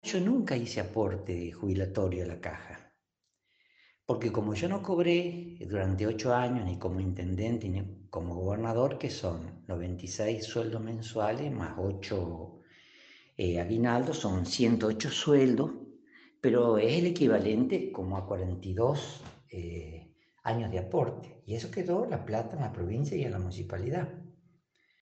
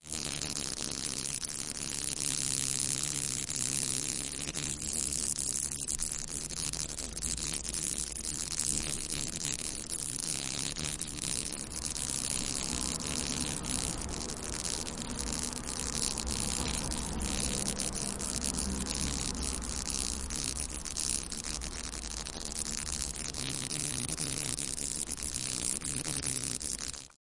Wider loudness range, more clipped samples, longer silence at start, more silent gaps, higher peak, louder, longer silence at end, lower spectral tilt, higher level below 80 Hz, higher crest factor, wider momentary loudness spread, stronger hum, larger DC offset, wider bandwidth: first, 7 LU vs 3 LU; neither; about the same, 0.05 s vs 0 s; neither; second, -12 dBFS vs -8 dBFS; about the same, -31 LUFS vs -33 LUFS; first, 0.7 s vs 0.1 s; first, -6.5 dB/octave vs -2 dB/octave; second, -58 dBFS vs -46 dBFS; second, 18 dB vs 28 dB; first, 14 LU vs 5 LU; neither; second, under 0.1% vs 0.1%; second, 8.6 kHz vs 11.5 kHz